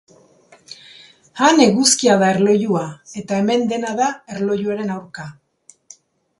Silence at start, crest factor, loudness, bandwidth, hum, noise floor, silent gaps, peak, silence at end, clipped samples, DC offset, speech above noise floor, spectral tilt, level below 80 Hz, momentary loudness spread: 0.7 s; 18 dB; -17 LUFS; 11.5 kHz; none; -51 dBFS; none; 0 dBFS; 1.05 s; under 0.1%; under 0.1%; 34 dB; -4 dB/octave; -62 dBFS; 23 LU